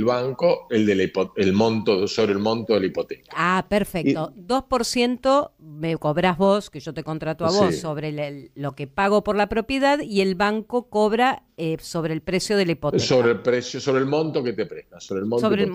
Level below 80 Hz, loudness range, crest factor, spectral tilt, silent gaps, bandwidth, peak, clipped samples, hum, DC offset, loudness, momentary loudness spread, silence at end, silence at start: -50 dBFS; 2 LU; 14 dB; -5.5 dB/octave; none; 15.5 kHz; -8 dBFS; under 0.1%; none; under 0.1%; -22 LUFS; 10 LU; 0 s; 0 s